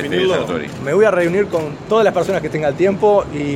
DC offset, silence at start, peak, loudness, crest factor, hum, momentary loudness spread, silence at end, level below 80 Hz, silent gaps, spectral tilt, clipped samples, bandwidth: under 0.1%; 0 s; -2 dBFS; -16 LUFS; 14 dB; none; 6 LU; 0 s; -46 dBFS; none; -6 dB/octave; under 0.1%; 14 kHz